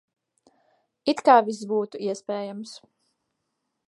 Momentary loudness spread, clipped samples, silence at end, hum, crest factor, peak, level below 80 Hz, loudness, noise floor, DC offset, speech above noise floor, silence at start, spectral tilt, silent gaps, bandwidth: 18 LU; under 0.1%; 1.1 s; none; 24 dB; -4 dBFS; -78 dBFS; -24 LUFS; -79 dBFS; under 0.1%; 56 dB; 1.05 s; -4.5 dB/octave; none; 11.5 kHz